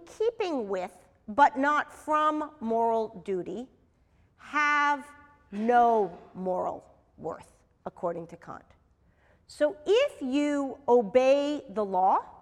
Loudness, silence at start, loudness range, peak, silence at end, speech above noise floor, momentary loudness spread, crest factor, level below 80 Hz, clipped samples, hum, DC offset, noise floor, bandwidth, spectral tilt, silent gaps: -27 LUFS; 0 s; 9 LU; -8 dBFS; 0.1 s; 37 dB; 18 LU; 20 dB; -66 dBFS; under 0.1%; none; under 0.1%; -65 dBFS; 12 kHz; -5 dB/octave; none